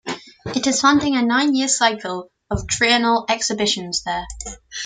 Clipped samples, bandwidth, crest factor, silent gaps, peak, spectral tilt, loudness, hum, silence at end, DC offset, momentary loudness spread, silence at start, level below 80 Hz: under 0.1%; 9.6 kHz; 18 dB; none; -2 dBFS; -2.5 dB/octave; -18 LUFS; none; 0 s; under 0.1%; 15 LU; 0.05 s; -42 dBFS